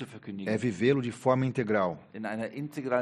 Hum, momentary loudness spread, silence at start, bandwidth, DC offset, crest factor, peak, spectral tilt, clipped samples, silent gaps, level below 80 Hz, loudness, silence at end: none; 10 LU; 0 s; 12 kHz; under 0.1%; 18 dB; -12 dBFS; -7 dB/octave; under 0.1%; none; -68 dBFS; -30 LUFS; 0 s